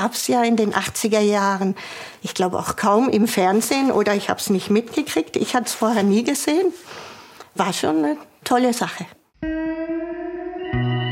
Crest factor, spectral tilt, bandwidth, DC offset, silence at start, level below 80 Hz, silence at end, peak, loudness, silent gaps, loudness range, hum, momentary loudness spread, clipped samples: 18 dB; -4.5 dB/octave; 17 kHz; under 0.1%; 0 s; -50 dBFS; 0 s; -2 dBFS; -20 LUFS; none; 4 LU; none; 13 LU; under 0.1%